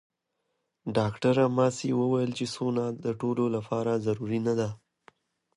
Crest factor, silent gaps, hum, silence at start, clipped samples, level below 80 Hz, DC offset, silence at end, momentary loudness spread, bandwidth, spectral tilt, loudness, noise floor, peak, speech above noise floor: 16 dB; none; none; 0.85 s; under 0.1%; -64 dBFS; under 0.1%; 0.8 s; 7 LU; 11 kHz; -6.5 dB/octave; -28 LUFS; -80 dBFS; -12 dBFS; 53 dB